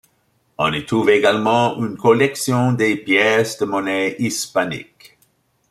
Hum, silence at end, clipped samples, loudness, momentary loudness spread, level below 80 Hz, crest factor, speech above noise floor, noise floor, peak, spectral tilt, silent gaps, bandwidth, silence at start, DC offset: none; 0.9 s; under 0.1%; -17 LUFS; 7 LU; -58 dBFS; 18 dB; 46 dB; -63 dBFS; -2 dBFS; -4.5 dB/octave; none; 15 kHz; 0.6 s; under 0.1%